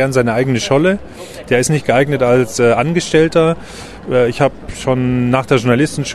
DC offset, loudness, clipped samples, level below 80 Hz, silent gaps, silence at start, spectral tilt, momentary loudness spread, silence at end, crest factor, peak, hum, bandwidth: under 0.1%; -14 LUFS; under 0.1%; -40 dBFS; none; 0 s; -5.5 dB/octave; 10 LU; 0 s; 14 dB; 0 dBFS; none; 13 kHz